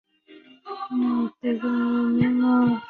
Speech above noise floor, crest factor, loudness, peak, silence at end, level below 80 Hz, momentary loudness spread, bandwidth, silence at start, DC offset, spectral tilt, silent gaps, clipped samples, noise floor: 29 dB; 14 dB; -23 LUFS; -8 dBFS; 0 s; -60 dBFS; 10 LU; 4.5 kHz; 0.3 s; under 0.1%; -9.5 dB/octave; none; under 0.1%; -51 dBFS